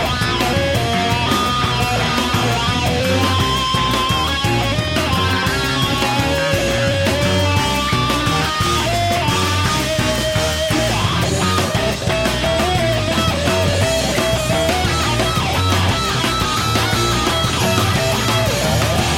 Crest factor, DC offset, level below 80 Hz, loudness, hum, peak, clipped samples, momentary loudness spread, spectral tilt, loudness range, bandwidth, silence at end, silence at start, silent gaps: 16 dB; under 0.1%; -30 dBFS; -16 LUFS; none; -2 dBFS; under 0.1%; 1 LU; -4 dB/octave; 1 LU; 16.5 kHz; 0 s; 0 s; none